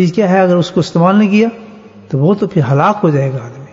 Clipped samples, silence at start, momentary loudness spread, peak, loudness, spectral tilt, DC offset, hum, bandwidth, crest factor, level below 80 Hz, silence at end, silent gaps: under 0.1%; 0 s; 7 LU; 0 dBFS; -12 LUFS; -8 dB/octave; under 0.1%; none; 7.8 kHz; 12 dB; -54 dBFS; 0.05 s; none